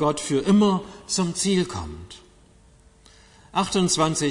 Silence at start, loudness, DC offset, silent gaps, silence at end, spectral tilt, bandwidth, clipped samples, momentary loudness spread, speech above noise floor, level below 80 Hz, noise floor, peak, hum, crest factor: 0 s; -22 LUFS; under 0.1%; none; 0 s; -4.5 dB/octave; 11 kHz; under 0.1%; 16 LU; 31 dB; -50 dBFS; -54 dBFS; -8 dBFS; none; 16 dB